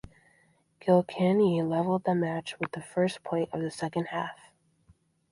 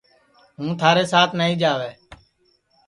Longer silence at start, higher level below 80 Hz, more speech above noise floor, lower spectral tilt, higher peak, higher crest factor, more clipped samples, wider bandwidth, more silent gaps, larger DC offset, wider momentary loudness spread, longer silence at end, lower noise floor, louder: first, 0.85 s vs 0.6 s; second, -66 dBFS vs -60 dBFS; second, 39 dB vs 45 dB; first, -7 dB/octave vs -5 dB/octave; second, -10 dBFS vs 0 dBFS; about the same, 20 dB vs 22 dB; neither; about the same, 11.5 kHz vs 11.5 kHz; neither; neither; second, 11 LU vs 14 LU; first, 0.95 s vs 0.7 s; about the same, -66 dBFS vs -64 dBFS; second, -29 LUFS vs -19 LUFS